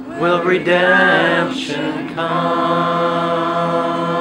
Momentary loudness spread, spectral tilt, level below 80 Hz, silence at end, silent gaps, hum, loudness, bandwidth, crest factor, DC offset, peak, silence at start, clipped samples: 9 LU; -5.5 dB/octave; -56 dBFS; 0 s; none; none; -16 LUFS; 11.5 kHz; 16 dB; under 0.1%; 0 dBFS; 0 s; under 0.1%